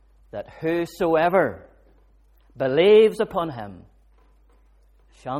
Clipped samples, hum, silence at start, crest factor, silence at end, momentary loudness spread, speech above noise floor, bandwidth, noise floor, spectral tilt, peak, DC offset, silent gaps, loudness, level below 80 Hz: under 0.1%; none; 0.35 s; 18 dB; 0 s; 23 LU; 36 dB; 13 kHz; -56 dBFS; -6.5 dB/octave; -6 dBFS; under 0.1%; none; -20 LUFS; -54 dBFS